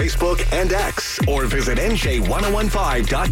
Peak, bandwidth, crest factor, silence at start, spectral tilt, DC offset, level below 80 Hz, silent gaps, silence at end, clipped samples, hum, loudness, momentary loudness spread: -12 dBFS; 16.5 kHz; 6 dB; 0 s; -4.5 dB/octave; under 0.1%; -22 dBFS; none; 0 s; under 0.1%; none; -20 LUFS; 1 LU